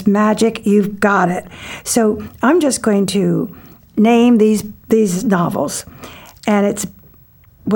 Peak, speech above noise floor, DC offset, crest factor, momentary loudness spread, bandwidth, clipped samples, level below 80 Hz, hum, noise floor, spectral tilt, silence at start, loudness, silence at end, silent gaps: -2 dBFS; 32 dB; under 0.1%; 14 dB; 15 LU; 18.5 kHz; under 0.1%; -48 dBFS; none; -47 dBFS; -5.5 dB/octave; 0 s; -15 LUFS; 0 s; none